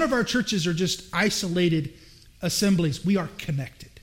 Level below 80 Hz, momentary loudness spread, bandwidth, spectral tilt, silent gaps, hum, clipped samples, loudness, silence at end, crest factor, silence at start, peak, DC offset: -50 dBFS; 9 LU; 16.5 kHz; -4.5 dB/octave; none; none; under 0.1%; -25 LUFS; 0.05 s; 14 dB; 0 s; -10 dBFS; under 0.1%